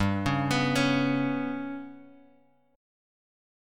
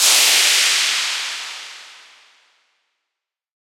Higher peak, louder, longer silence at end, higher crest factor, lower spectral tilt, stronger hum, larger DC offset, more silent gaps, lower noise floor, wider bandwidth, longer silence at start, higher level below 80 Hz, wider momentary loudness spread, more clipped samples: second, -12 dBFS vs 0 dBFS; second, -27 LUFS vs -14 LUFS; second, 1.7 s vs 1.85 s; about the same, 18 dB vs 20 dB; first, -5.5 dB/octave vs 5 dB/octave; neither; neither; neither; second, -63 dBFS vs -83 dBFS; about the same, 15.5 kHz vs 16.5 kHz; about the same, 0 s vs 0 s; first, -54 dBFS vs -84 dBFS; second, 14 LU vs 20 LU; neither